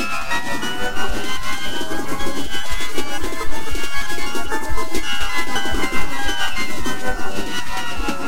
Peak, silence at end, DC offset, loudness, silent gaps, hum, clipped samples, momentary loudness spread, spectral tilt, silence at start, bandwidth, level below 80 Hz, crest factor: -4 dBFS; 0 s; 20%; -24 LUFS; none; none; under 0.1%; 4 LU; -3 dB/octave; 0 s; 16 kHz; -32 dBFS; 12 dB